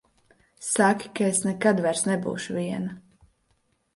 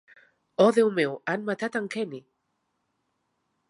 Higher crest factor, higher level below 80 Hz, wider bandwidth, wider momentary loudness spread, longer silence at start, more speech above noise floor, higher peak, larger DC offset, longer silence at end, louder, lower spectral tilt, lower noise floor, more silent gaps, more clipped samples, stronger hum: about the same, 18 dB vs 20 dB; first, -66 dBFS vs -82 dBFS; about the same, 11.5 kHz vs 11.5 kHz; second, 10 LU vs 15 LU; about the same, 0.6 s vs 0.6 s; second, 45 dB vs 52 dB; about the same, -8 dBFS vs -8 dBFS; neither; second, 0.95 s vs 1.5 s; about the same, -25 LUFS vs -25 LUFS; about the same, -4.5 dB/octave vs -5.5 dB/octave; second, -70 dBFS vs -77 dBFS; neither; neither; neither